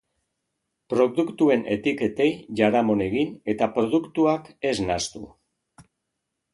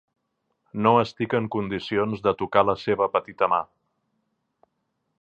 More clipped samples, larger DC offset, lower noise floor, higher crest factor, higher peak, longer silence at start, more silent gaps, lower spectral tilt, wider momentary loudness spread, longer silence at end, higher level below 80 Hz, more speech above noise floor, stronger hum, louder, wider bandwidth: neither; neither; first, -80 dBFS vs -76 dBFS; about the same, 20 dB vs 22 dB; about the same, -4 dBFS vs -2 dBFS; first, 0.9 s vs 0.75 s; neither; second, -5.5 dB/octave vs -7.5 dB/octave; about the same, 6 LU vs 7 LU; second, 0.75 s vs 1.55 s; about the same, -56 dBFS vs -58 dBFS; first, 58 dB vs 53 dB; neither; about the same, -23 LUFS vs -24 LUFS; first, 11.5 kHz vs 8 kHz